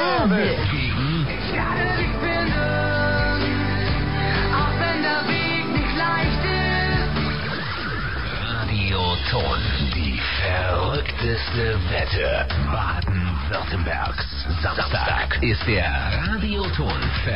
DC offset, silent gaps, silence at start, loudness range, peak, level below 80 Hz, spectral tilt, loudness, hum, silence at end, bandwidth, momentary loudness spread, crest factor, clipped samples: 2%; none; 0 s; 2 LU; -8 dBFS; -30 dBFS; -8.5 dB/octave; -22 LUFS; none; 0 s; 5.6 kHz; 4 LU; 14 dB; under 0.1%